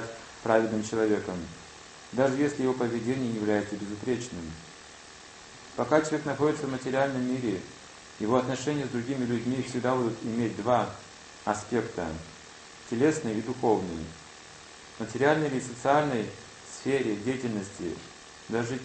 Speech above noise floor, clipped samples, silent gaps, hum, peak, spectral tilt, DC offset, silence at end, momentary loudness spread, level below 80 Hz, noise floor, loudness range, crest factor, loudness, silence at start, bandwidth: 20 dB; under 0.1%; none; none; -8 dBFS; -5.5 dB/octave; under 0.1%; 0 s; 20 LU; -60 dBFS; -48 dBFS; 2 LU; 22 dB; -29 LUFS; 0 s; 8.8 kHz